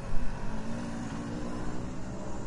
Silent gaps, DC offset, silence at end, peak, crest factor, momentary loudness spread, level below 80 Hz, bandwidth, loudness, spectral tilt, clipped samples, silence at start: none; under 0.1%; 0 s; -12 dBFS; 16 dB; 2 LU; -38 dBFS; 10.5 kHz; -38 LUFS; -6.5 dB/octave; under 0.1%; 0 s